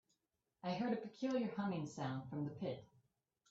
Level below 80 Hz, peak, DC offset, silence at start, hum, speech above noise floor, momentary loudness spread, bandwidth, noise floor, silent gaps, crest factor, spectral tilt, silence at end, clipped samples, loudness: -80 dBFS; -26 dBFS; under 0.1%; 0.65 s; none; 45 dB; 7 LU; 8 kHz; -87 dBFS; none; 18 dB; -6.5 dB/octave; 0.65 s; under 0.1%; -43 LUFS